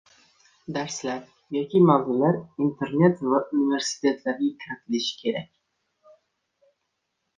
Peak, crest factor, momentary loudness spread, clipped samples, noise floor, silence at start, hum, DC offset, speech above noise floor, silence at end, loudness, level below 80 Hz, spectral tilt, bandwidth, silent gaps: -4 dBFS; 20 dB; 13 LU; under 0.1%; -78 dBFS; 0.7 s; none; under 0.1%; 55 dB; 1.95 s; -24 LUFS; -68 dBFS; -5.5 dB/octave; 9.6 kHz; none